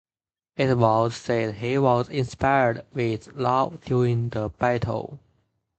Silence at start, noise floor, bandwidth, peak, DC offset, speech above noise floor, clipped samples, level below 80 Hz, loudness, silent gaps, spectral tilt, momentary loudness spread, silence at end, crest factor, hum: 0.6 s; under -90 dBFS; 8.6 kHz; -4 dBFS; under 0.1%; over 67 dB; under 0.1%; -50 dBFS; -24 LUFS; none; -7 dB/octave; 8 LU; 0.6 s; 20 dB; none